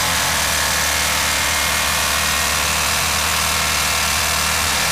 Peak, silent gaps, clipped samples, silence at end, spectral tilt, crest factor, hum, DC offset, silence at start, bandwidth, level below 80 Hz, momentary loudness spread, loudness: -6 dBFS; none; under 0.1%; 0 s; -1 dB/octave; 12 dB; none; 0.8%; 0 s; 16 kHz; -34 dBFS; 0 LU; -16 LUFS